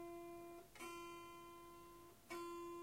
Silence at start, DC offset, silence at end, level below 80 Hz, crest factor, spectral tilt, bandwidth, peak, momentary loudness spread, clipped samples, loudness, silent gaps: 0 s; under 0.1%; 0 s; -76 dBFS; 14 dB; -3.5 dB/octave; 16 kHz; -40 dBFS; 9 LU; under 0.1%; -55 LUFS; none